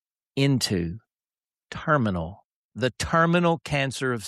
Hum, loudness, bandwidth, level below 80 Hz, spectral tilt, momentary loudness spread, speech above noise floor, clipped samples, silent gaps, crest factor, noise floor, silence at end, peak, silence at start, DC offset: none; -24 LUFS; 13.5 kHz; -50 dBFS; -5.5 dB/octave; 16 LU; over 66 dB; under 0.1%; 2.45-2.72 s; 18 dB; under -90 dBFS; 0 s; -6 dBFS; 0.35 s; under 0.1%